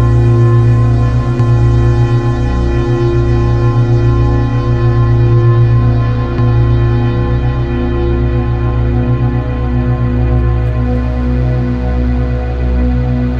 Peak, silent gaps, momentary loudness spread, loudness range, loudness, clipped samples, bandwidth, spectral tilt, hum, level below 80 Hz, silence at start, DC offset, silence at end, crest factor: 0 dBFS; none; 5 LU; 3 LU; -12 LUFS; under 0.1%; 5.6 kHz; -9.5 dB/octave; 60 Hz at -35 dBFS; -16 dBFS; 0 s; under 0.1%; 0 s; 10 dB